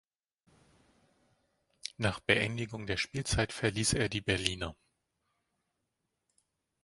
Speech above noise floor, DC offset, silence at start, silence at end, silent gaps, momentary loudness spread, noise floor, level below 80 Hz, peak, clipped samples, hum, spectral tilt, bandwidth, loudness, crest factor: 51 dB; under 0.1%; 1.85 s; 2.1 s; none; 11 LU; -84 dBFS; -52 dBFS; -6 dBFS; under 0.1%; none; -3.5 dB/octave; 11.5 kHz; -32 LUFS; 30 dB